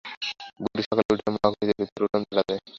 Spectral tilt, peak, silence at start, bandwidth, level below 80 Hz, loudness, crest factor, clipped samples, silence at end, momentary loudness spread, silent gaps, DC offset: -6 dB/octave; -6 dBFS; 0.05 s; 7.6 kHz; -58 dBFS; -26 LUFS; 22 dB; under 0.1%; 0 s; 8 LU; 0.17-0.21 s, 0.86-0.91 s, 1.05-1.09 s, 1.92-1.96 s; under 0.1%